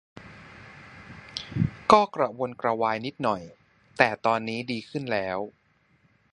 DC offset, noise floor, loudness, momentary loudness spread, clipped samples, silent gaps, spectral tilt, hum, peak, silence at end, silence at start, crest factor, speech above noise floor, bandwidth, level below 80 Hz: under 0.1%; -65 dBFS; -26 LUFS; 26 LU; under 0.1%; none; -6 dB/octave; none; 0 dBFS; 0.85 s; 0.15 s; 26 dB; 39 dB; 11 kHz; -56 dBFS